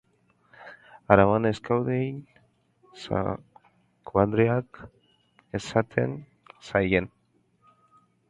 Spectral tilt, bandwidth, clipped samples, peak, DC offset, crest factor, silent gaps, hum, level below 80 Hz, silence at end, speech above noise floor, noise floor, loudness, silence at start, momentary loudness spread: -7.5 dB/octave; 10.5 kHz; under 0.1%; 0 dBFS; under 0.1%; 28 dB; none; none; -52 dBFS; 1.25 s; 43 dB; -67 dBFS; -25 LUFS; 0.6 s; 23 LU